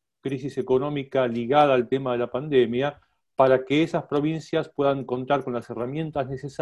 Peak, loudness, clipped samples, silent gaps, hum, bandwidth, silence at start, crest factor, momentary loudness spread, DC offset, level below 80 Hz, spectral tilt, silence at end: -4 dBFS; -24 LUFS; under 0.1%; none; none; 10.5 kHz; 0.25 s; 20 dB; 10 LU; under 0.1%; -60 dBFS; -7 dB/octave; 0.05 s